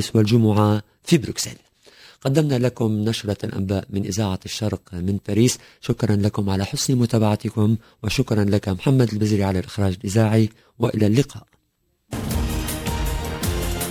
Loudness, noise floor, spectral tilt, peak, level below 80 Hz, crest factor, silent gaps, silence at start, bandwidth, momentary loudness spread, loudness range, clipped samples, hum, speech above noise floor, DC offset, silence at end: -22 LUFS; -69 dBFS; -6 dB/octave; -4 dBFS; -36 dBFS; 18 dB; none; 0 s; 16 kHz; 8 LU; 3 LU; under 0.1%; none; 48 dB; under 0.1%; 0 s